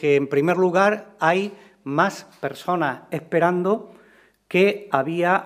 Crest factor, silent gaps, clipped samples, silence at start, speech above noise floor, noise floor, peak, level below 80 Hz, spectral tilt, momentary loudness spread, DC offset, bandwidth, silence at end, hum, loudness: 20 dB; none; under 0.1%; 0 s; 34 dB; -55 dBFS; -2 dBFS; -70 dBFS; -6.5 dB/octave; 11 LU; under 0.1%; 15.5 kHz; 0 s; none; -22 LUFS